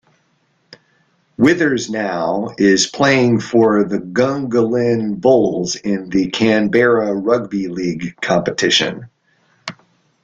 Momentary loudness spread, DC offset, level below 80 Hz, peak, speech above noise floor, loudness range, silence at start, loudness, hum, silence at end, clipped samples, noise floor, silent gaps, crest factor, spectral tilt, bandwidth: 9 LU; under 0.1%; -54 dBFS; -2 dBFS; 46 dB; 2 LU; 1.4 s; -16 LUFS; none; 0.5 s; under 0.1%; -61 dBFS; none; 16 dB; -4.5 dB/octave; 9.4 kHz